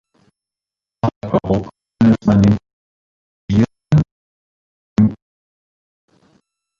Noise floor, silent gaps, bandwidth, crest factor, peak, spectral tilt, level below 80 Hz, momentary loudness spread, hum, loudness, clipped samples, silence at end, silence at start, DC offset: -89 dBFS; 1.16-1.21 s, 2.73-3.48 s, 4.11-4.96 s; 7.4 kHz; 16 dB; -2 dBFS; -9 dB/octave; -40 dBFS; 10 LU; none; -17 LUFS; under 0.1%; 1.65 s; 1.05 s; under 0.1%